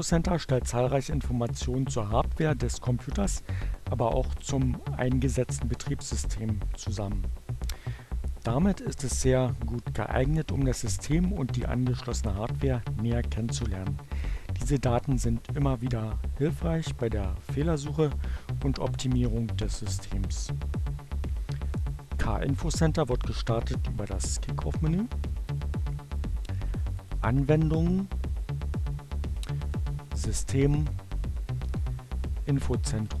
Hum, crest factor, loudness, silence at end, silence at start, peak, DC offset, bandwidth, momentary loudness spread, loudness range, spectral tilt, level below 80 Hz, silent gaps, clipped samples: none; 18 dB; -30 LUFS; 0 s; 0 s; -10 dBFS; under 0.1%; 13 kHz; 8 LU; 3 LU; -6 dB/octave; -34 dBFS; none; under 0.1%